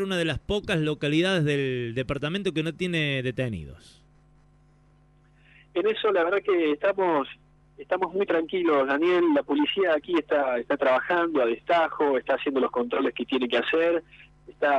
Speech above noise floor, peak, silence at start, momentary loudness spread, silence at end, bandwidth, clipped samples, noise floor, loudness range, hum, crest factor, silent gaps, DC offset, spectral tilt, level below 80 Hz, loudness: 34 dB; -12 dBFS; 0 s; 6 LU; 0 s; 11.5 kHz; under 0.1%; -59 dBFS; 7 LU; none; 14 dB; none; under 0.1%; -6.5 dB/octave; -54 dBFS; -25 LUFS